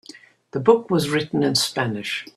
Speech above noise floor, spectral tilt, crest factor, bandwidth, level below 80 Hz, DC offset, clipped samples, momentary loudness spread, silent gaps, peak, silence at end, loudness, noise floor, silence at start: 26 dB; -4.5 dB/octave; 20 dB; 14.5 kHz; -60 dBFS; under 0.1%; under 0.1%; 7 LU; none; -2 dBFS; 0.05 s; -21 LUFS; -46 dBFS; 0.55 s